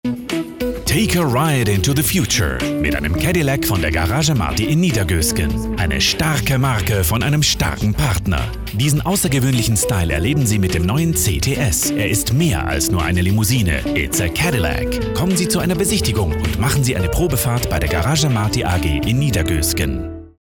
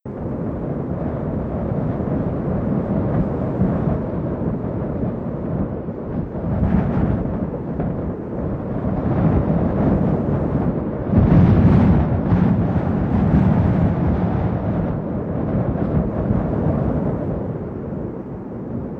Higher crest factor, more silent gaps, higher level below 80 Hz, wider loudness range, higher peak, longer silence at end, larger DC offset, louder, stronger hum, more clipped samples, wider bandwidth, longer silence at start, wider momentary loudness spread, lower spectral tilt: second, 10 dB vs 16 dB; neither; about the same, -28 dBFS vs -30 dBFS; second, 1 LU vs 6 LU; about the same, -6 dBFS vs -4 dBFS; about the same, 0.1 s vs 0 s; neither; first, -17 LUFS vs -20 LUFS; neither; neither; first, 20 kHz vs 4.6 kHz; about the same, 0.05 s vs 0.05 s; second, 4 LU vs 10 LU; second, -4.5 dB/octave vs -11.5 dB/octave